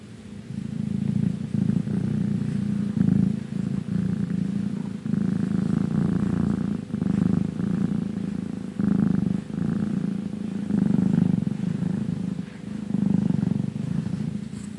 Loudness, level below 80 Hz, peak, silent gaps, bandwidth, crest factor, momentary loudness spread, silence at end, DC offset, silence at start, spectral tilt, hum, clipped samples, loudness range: -26 LUFS; -52 dBFS; -8 dBFS; none; 11 kHz; 16 dB; 8 LU; 0 s; under 0.1%; 0 s; -9 dB/octave; none; under 0.1%; 1 LU